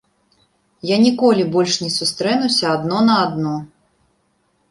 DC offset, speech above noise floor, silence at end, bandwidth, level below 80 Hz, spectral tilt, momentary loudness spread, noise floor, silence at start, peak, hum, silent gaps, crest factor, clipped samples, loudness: under 0.1%; 47 dB; 1.05 s; 11.5 kHz; -60 dBFS; -4.5 dB/octave; 9 LU; -64 dBFS; 0.85 s; -2 dBFS; none; none; 16 dB; under 0.1%; -17 LUFS